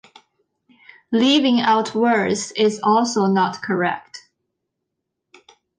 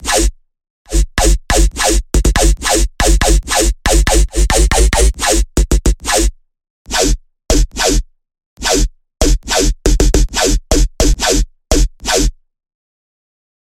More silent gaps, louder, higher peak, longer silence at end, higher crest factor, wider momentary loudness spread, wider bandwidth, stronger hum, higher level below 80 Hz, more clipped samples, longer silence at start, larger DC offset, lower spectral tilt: second, none vs 0.70-0.85 s, 6.70-6.85 s, 8.46-8.57 s; second, -18 LUFS vs -14 LUFS; second, -6 dBFS vs 0 dBFS; first, 1.6 s vs 1.35 s; about the same, 16 dB vs 12 dB; about the same, 7 LU vs 5 LU; second, 10 kHz vs 16 kHz; neither; second, -66 dBFS vs -14 dBFS; neither; first, 1.1 s vs 0 s; neither; about the same, -4.5 dB/octave vs -3.5 dB/octave